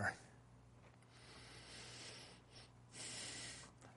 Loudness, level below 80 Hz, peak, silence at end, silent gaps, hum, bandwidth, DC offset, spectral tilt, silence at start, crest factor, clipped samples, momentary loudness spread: -52 LUFS; -74 dBFS; -28 dBFS; 0 s; none; none; 11.5 kHz; under 0.1%; -2.5 dB/octave; 0 s; 24 dB; under 0.1%; 17 LU